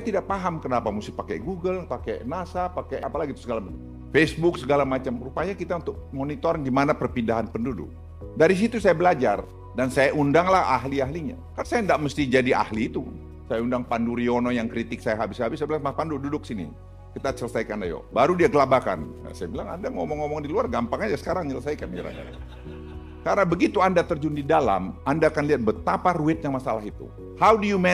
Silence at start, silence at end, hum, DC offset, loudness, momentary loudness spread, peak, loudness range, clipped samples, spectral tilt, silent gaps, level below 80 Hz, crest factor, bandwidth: 0 s; 0 s; none; under 0.1%; -24 LUFS; 14 LU; -6 dBFS; 6 LU; under 0.1%; -6.5 dB/octave; none; -44 dBFS; 18 dB; 14.5 kHz